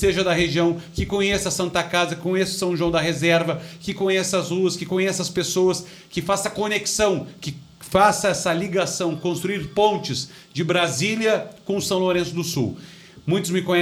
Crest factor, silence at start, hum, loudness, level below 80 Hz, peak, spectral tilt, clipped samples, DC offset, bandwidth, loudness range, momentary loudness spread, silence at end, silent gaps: 18 dB; 0 s; none; -22 LUFS; -46 dBFS; -4 dBFS; -4 dB/octave; under 0.1%; under 0.1%; 19 kHz; 1 LU; 9 LU; 0 s; none